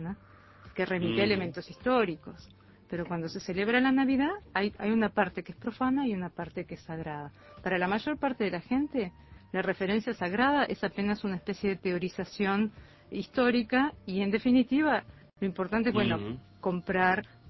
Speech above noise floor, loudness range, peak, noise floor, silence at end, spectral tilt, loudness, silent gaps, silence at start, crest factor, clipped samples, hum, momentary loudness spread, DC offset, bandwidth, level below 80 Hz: 25 dB; 4 LU; -10 dBFS; -55 dBFS; 0 s; -7 dB/octave; -30 LUFS; none; 0 s; 20 dB; under 0.1%; none; 13 LU; under 0.1%; 6 kHz; -58 dBFS